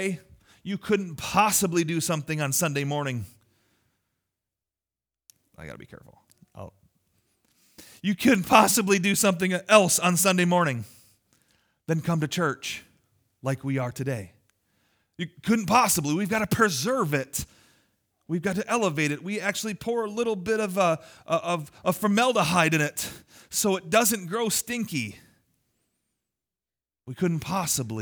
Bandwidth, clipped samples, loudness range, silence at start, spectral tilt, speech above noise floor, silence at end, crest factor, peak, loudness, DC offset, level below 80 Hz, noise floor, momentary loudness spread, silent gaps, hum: over 20 kHz; under 0.1%; 10 LU; 0 s; -4 dB/octave; over 65 dB; 0 s; 24 dB; -2 dBFS; -25 LUFS; under 0.1%; -60 dBFS; under -90 dBFS; 15 LU; none; none